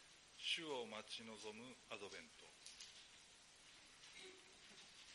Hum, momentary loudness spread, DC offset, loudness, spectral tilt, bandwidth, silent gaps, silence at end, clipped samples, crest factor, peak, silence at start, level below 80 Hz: none; 18 LU; under 0.1%; -52 LUFS; -1.5 dB/octave; 11.5 kHz; none; 0 s; under 0.1%; 26 dB; -30 dBFS; 0 s; -84 dBFS